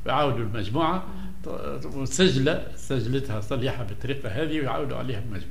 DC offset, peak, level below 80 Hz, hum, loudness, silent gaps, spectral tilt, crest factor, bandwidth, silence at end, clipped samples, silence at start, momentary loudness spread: 3%; -6 dBFS; -44 dBFS; none; -27 LUFS; none; -5.5 dB/octave; 20 dB; 15.5 kHz; 0 s; under 0.1%; 0 s; 12 LU